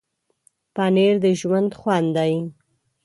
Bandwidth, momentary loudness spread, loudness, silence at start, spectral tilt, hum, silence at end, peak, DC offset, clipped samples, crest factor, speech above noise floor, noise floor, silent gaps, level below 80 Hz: 11.5 kHz; 10 LU; -20 LUFS; 0.75 s; -6.5 dB/octave; none; 0.55 s; -6 dBFS; under 0.1%; under 0.1%; 16 dB; 44 dB; -63 dBFS; none; -64 dBFS